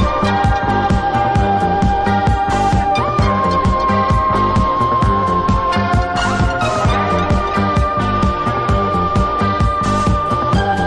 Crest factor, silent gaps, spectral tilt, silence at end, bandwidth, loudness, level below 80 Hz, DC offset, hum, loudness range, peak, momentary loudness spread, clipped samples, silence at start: 12 dB; none; -6.5 dB/octave; 0 s; 11 kHz; -15 LUFS; -24 dBFS; under 0.1%; none; 1 LU; -2 dBFS; 2 LU; under 0.1%; 0 s